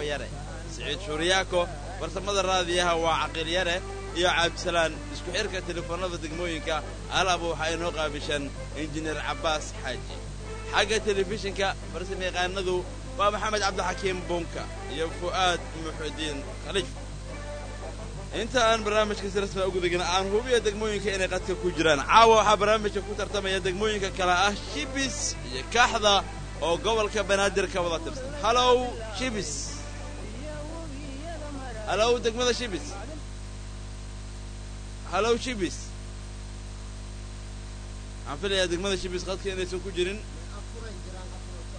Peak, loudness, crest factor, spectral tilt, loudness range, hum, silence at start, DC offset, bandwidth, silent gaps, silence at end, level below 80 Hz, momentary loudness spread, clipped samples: -6 dBFS; -27 LUFS; 22 dB; -3.5 dB/octave; 9 LU; 50 Hz at -40 dBFS; 0 s; under 0.1%; 9.6 kHz; none; 0 s; -40 dBFS; 17 LU; under 0.1%